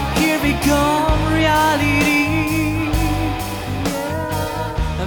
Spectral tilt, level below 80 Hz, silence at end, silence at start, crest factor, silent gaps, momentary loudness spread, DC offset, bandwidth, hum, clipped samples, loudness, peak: -5 dB/octave; -28 dBFS; 0 s; 0 s; 12 dB; none; 8 LU; under 0.1%; over 20 kHz; none; under 0.1%; -18 LUFS; -6 dBFS